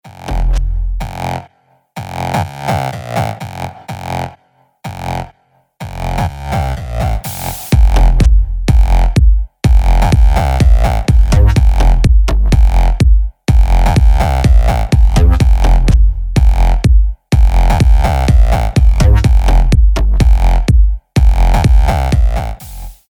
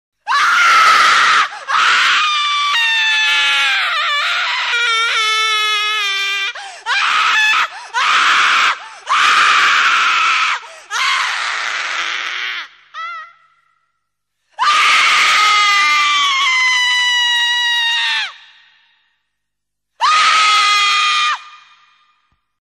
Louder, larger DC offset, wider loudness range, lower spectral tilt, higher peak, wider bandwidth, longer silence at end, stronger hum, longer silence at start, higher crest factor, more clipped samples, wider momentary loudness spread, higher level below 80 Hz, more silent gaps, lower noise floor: about the same, -13 LUFS vs -12 LUFS; neither; first, 10 LU vs 6 LU; first, -6.5 dB/octave vs 3 dB/octave; about the same, 0 dBFS vs 0 dBFS; first, 19.5 kHz vs 16 kHz; second, 0.2 s vs 1.1 s; second, none vs 50 Hz at -75 dBFS; second, 0.05 s vs 0.25 s; about the same, 10 dB vs 14 dB; neither; about the same, 12 LU vs 10 LU; first, -10 dBFS vs -66 dBFS; neither; second, -53 dBFS vs -79 dBFS